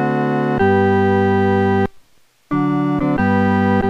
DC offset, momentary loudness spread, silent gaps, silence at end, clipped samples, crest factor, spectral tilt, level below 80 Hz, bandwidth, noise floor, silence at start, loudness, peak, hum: under 0.1%; 5 LU; none; 0 s; under 0.1%; 12 dB; -9 dB/octave; -44 dBFS; 7 kHz; -53 dBFS; 0 s; -16 LUFS; -4 dBFS; none